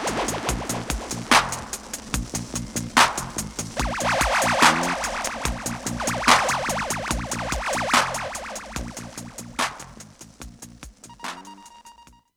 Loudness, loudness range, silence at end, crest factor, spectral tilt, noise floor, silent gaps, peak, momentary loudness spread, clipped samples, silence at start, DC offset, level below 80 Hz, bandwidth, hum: -23 LUFS; 12 LU; 0.35 s; 26 dB; -2.5 dB/octave; -50 dBFS; none; 0 dBFS; 23 LU; under 0.1%; 0 s; under 0.1%; -40 dBFS; over 20 kHz; none